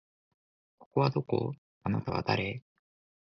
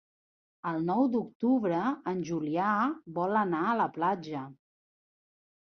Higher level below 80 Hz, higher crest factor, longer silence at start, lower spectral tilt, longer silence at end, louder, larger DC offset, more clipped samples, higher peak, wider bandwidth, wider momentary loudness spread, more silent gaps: first, -58 dBFS vs -76 dBFS; first, 22 dB vs 16 dB; first, 0.8 s vs 0.65 s; about the same, -8 dB/octave vs -7.5 dB/octave; second, 0.7 s vs 1.1 s; about the same, -32 LUFS vs -30 LUFS; neither; neither; about the same, -12 dBFS vs -14 dBFS; about the same, 6.4 kHz vs 6.4 kHz; about the same, 9 LU vs 8 LU; first, 0.86-0.91 s, 1.58-1.81 s vs 1.35-1.40 s